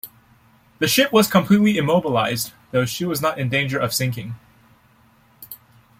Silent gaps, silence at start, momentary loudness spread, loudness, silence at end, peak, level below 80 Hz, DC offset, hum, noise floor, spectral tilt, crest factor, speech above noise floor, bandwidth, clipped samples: none; 0.05 s; 23 LU; -19 LUFS; 0.45 s; -2 dBFS; -56 dBFS; under 0.1%; none; -55 dBFS; -4.5 dB/octave; 20 dB; 36 dB; 16.5 kHz; under 0.1%